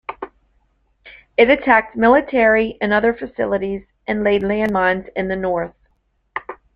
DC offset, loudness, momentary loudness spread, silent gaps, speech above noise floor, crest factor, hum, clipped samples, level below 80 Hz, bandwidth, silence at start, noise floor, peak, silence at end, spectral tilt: under 0.1%; -17 LUFS; 17 LU; none; 48 dB; 18 dB; none; under 0.1%; -46 dBFS; 5.4 kHz; 0.1 s; -64 dBFS; -2 dBFS; 0.2 s; -8 dB/octave